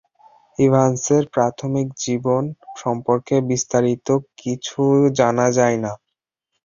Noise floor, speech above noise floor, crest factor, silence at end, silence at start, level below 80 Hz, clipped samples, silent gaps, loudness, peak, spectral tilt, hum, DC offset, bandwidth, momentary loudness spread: -80 dBFS; 62 dB; 18 dB; 0.7 s; 0.6 s; -56 dBFS; under 0.1%; none; -19 LUFS; -2 dBFS; -6 dB/octave; none; under 0.1%; 7.4 kHz; 11 LU